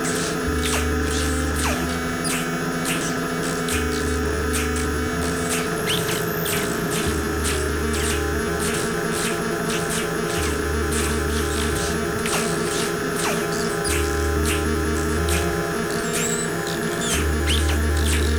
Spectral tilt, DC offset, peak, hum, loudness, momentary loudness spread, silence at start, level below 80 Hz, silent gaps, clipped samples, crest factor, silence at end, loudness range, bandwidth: -4 dB/octave; under 0.1%; -8 dBFS; none; -22 LUFS; 2 LU; 0 s; -30 dBFS; none; under 0.1%; 14 dB; 0 s; 1 LU; over 20 kHz